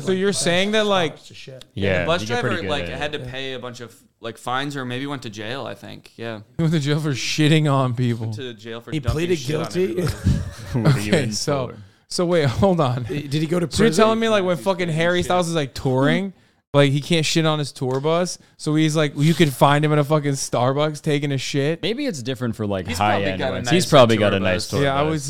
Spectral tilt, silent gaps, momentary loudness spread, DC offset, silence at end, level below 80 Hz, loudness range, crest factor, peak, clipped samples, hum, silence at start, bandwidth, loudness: -5.5 dB/octave; 16.67-16.73 s; 13 LU; 0.9%; 0 s; -44 dBFS; 6 LU; 20 dB; 0 dBFS; under 0.1%; none; 0 s; 16 kHz; -20 LUFS